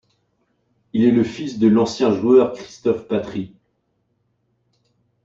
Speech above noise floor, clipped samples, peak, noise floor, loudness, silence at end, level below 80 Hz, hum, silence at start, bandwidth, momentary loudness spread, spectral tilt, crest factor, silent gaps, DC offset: 51 dB; under 0.1%; -4 dBFS; -69 dBFS; -19 LUFS; 1.8 s; -58 dBFS; none; 0.95 s; 7.8 kHz; 12 LU; -7 dB/octave; 16 dB; none; under 0.1%